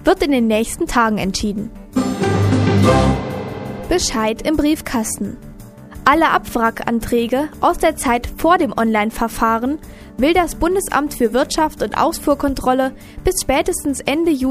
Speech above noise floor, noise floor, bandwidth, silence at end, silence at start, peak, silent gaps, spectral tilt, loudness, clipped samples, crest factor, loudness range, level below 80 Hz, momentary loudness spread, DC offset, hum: 19 dB; -36 dBFS; 15.5 kHz; 0 s; 0 s; 0 dBFS; none; -5 dB/octave; -17 LUFS; under 0.1%; 18 dB; 2 LU; -34 dBFS; 8 LU; under 0.1%; none